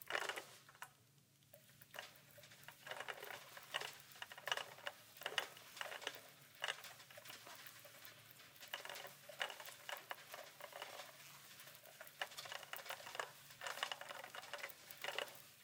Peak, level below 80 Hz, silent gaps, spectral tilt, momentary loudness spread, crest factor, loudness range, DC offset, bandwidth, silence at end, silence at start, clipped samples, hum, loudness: -20 dBFS; under -90 dBFS; none; -0.5 dB/octave; 14 LU; 32 dB; 5 LU; under 0.1%; 18 kHz; 0 s; 0 s; under 0.1%; none; -50 LUFS